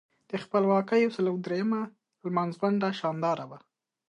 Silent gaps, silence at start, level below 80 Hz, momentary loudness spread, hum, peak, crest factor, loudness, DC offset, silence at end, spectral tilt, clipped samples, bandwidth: none; 0.3 s; -78 dBFS; 13 LU; none; -12 dBFS; 18 dB; -28 LUFS; under 0.1%; 0.5 s; -7.5 dB/octave; under 0.1%; 9.8 kHz